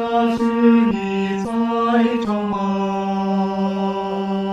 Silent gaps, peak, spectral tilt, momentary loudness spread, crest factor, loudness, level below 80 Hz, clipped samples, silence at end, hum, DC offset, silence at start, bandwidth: none; -4 dBFS; -7.5 dB/octave; 7 LU; 14 dB; -19 LUFS; -52 dBFS; under 0.1%; 0 s; none; under 0.1%; 0 s; 7.8 kHz